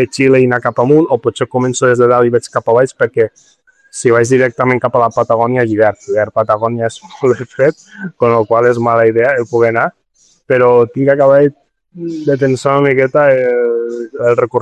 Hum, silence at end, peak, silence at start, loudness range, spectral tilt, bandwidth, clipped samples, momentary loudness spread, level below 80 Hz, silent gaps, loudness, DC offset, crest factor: none; 0 s; 0 dBFS; 0 s; 2 LU; -6.5 dB/octave; 10 kHz; under 0.1%; 7 LU; -52 dBFS; none; -12 LUFS; under 0.1%; 12 dB